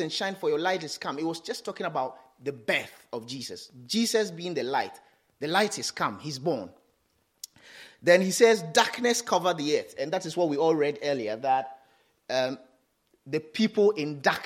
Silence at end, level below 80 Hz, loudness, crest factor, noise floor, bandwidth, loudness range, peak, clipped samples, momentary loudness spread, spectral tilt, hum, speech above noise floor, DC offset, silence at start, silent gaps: 0 s; -78 dBFS; -27 LUFS; 24 dB; -71 dBFS; 16 kHz; 6 LU; -4 dBFS; under 0.1%; 16 LU; -3.5 dB/octave; none; 44 dB; under 0.1%; 0 s; none